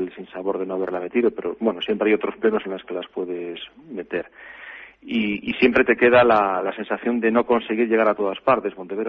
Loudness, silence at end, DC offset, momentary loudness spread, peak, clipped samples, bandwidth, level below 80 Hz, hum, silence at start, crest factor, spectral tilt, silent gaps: -21 LUFS; 0 s; under 0.1%; 17 LU; -4 dBFS; under 0.1%; 5.6 kHz; -58 dBFS; none; 0 s; 18 dB; -8 dB/octave; none